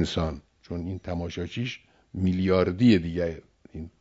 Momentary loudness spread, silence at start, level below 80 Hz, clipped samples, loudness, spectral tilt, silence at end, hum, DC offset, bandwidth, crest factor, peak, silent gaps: 21 LU; 0 s; -46 dBFS; under 0.1%; -26 LUFS; -7 dB/octave; 0.1 s; none; under 0.1%; 7.8 kHz; 18 dB; -8 dBFS; none